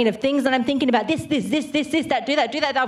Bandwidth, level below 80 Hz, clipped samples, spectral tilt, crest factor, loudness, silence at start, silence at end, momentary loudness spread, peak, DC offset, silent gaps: 13 kHz; -58 dBFS; under 0.1%; -4.5 dB/octave; 18 dB; -21 LUFS; 0 s; 0 s; 3 LU; -4 dBFS; under 0.1%; none